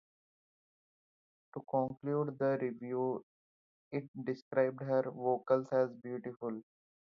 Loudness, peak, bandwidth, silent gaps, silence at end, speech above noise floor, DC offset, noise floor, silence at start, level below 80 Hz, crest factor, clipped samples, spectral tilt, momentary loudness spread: -36 LUFS; -16 dBFS; 6.6 kHz; 3.23-3.91 s, 4.08-4.14 s, 4.42-4.51 s; 0.6 s; over 55 dB; under 0.1%; under -90 dBFS; 1.55 s; -82 dBFS; 20 dB; under 0.1%; -7.5 dB/octave; 11 LU